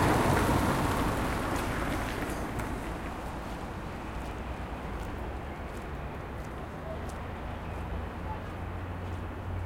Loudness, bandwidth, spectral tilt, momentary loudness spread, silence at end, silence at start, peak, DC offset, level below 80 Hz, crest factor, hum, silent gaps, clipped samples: -34 LUFS; 16.5 kHz; -6 dB/octave; 12 LU; 0 s; 0 s; -14 dBFS; under 0.1%; -40 dBFS; 18 dB; none; none; under 0.1%